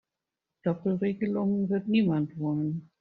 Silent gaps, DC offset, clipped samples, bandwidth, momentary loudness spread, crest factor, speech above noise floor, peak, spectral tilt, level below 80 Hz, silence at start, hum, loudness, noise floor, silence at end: none; under 0.1%; under 0.1%; 4.5 kHz; 7 LU; 14 dB; 60 dB; -14 dBFS; -8 dB/octave; -68 dBFS; 0.65 s; none; -29 LUFS; -87 dBFS; 0.15 s